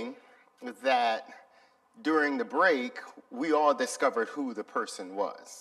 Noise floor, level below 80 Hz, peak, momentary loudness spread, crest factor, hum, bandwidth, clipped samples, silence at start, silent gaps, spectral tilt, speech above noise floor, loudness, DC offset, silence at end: -63 dBFS; -90 dBFS; -12 dBFS; 15 LU; 18 dB; none; 13.5 kHz; under 0.1%; 0 s; none; -2.5 dB/octave; 33 dB; -29 LUFS; under 0.1%; 0 s